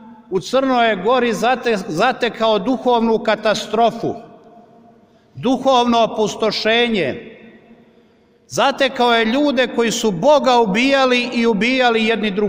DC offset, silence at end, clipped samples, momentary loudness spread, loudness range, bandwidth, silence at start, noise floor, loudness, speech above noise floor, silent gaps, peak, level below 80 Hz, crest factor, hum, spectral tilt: under 0.1%; 0 s; under 0.1%; 7 LU; 4 LU; 16 kHz; 0 s; -53 dBFS; -16 LUFS; 37 dB; none; -2 dBFS; -52 dBFS; 14 dB; none; -4 dB/octave